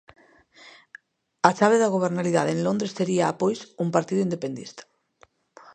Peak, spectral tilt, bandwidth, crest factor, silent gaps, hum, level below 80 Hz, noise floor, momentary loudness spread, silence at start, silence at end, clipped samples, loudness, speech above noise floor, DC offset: 0 dBFS; -5.5 dB/octave; 9.6 kHz; 24 dB; none; none; -70 dBFS; -60 dBFS; 11 LU; 0.65 s; 0.95 s; under 0.1%; -23 LUFS; 37 dB; under 0.1%